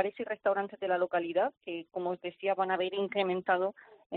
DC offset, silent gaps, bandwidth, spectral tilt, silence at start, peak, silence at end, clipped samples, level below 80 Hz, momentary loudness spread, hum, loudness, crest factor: under 0.1%; 4.06-4.10 s; 4.5 kHz; -3 dB/octave; 0 s; -16 dBFS; 0 s; under 0.1%; -78 dBFS; 6 LU; none; -32 LUFS; 18 dB